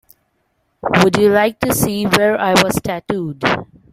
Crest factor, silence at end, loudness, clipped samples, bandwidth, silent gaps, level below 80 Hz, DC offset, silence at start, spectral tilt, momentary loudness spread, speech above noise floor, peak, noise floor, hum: 16 dB; 0.3 s; -15 LUFS; under 0.1%; 16 kHz; none; -44 dBFS; under 0.1%; 0.85 s; -4.5 dB/octave; 9 LU; 50 dB; 0 dBFS; -65 dBFS; none